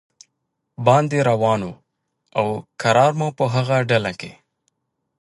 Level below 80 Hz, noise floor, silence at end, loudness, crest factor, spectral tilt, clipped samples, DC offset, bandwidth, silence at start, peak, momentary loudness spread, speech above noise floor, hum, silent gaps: -58 dBFS; -76 dBFS; 0.9 s; -19 LUFS; 20 dB; -6 dB/octave; under 0.1%; under 0.1%; 11.5 kHz; 0.8 s; -2 dBFS; 12 LU; 57 dB; none; none